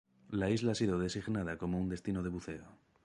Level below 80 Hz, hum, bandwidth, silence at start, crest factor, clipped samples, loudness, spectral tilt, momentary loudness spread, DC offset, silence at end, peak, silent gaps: -56 dBFS; none; 11.5 kHz; 0.3 s; 16 dB; under 0.1%; -36 LUFS; -6 dB/octave; 10 LU; under 0.1%; 0.3 s; -20 dBFS; none